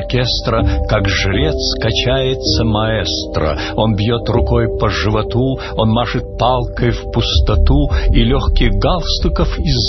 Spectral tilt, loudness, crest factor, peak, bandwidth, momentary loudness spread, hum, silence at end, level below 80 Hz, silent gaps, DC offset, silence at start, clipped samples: -6 dB/octave; -15 LUFS; 14 dB; 0 dBFS; 6.2 kHz; 3 LU; none; 0 s; -18 dBFS; none; under 0.1%; 0 s; under 0.1%